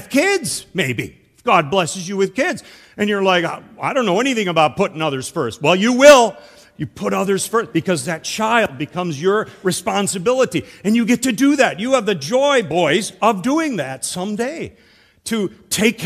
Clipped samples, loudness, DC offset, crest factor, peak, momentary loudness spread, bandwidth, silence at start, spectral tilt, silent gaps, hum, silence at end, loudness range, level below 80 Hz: 0.2%; -17 LUFS; under 0.1%; 18 dB; 0 dBFS; 9 LU; 15 kHz; 0 s; -4 dB/octave; none; none; 0 s; 5 LU; -56 dBFS